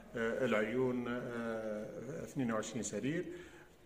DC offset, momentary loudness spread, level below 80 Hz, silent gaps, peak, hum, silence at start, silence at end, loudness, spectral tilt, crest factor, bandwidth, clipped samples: under 0.1%; 11 LU; -66 dBFS; none; -20 dBFS; none; 0 s; 0 s; -38 LUFS; -5 dB/octave; 18 dB; 15.5 kHz; under 0.1%